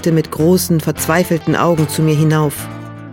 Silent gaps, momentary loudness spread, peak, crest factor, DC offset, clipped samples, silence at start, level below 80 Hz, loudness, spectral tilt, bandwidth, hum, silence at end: none; 8 LU; 0 dBFS; 14 dB; under 0.1%; under 0.1%; 0 s; -44 dBFS; -14 LUFS; -6 dB/octave; 17.5 kHz; none; 0 s